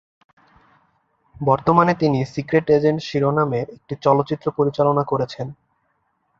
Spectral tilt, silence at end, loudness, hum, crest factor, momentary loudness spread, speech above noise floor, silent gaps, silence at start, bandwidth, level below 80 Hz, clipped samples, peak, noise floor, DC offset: -8 dB/octave; 0.85 s; -19 LUFS; none; 20 dB; 10 LU; 49 dB; none; 1.4 s; 7.4 kHz; -54 dBFS; under 0.1%; 0 dBFS; -68 dBFS; under 0.1%